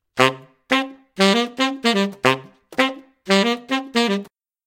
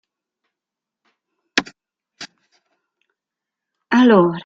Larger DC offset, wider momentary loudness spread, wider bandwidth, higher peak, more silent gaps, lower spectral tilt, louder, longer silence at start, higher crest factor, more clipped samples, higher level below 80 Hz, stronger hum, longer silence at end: neither; second, 9 LU vs 25 LU; first, 17 kHz vs 7.6 kHz; about the same, 0 dBFS vs 0 dBFS; neither; second, -4 dB/octave vs -5.5 dB/octave; second, -20 LUFS vs -16 LUFS; second, 0.15 s vs 1.55 s; about the same, 20 dB vs 20 dB; neither; about the same, -66 dBFS vs -64 dBFS; neither; first, 0.4 s vs 0.05 s